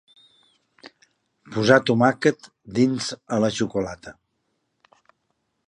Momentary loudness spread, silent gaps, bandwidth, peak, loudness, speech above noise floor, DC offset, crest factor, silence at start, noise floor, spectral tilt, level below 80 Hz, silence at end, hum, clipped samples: 16 LU; none; 11 kHz; -2 dBFS; -22 LUFS; 53 dB; under 0.1%; 22 dB; 1.5 s; -74 dBFS; -5.5 dB/octave; -60 dBFS; 1.55 s; none; under 0.1%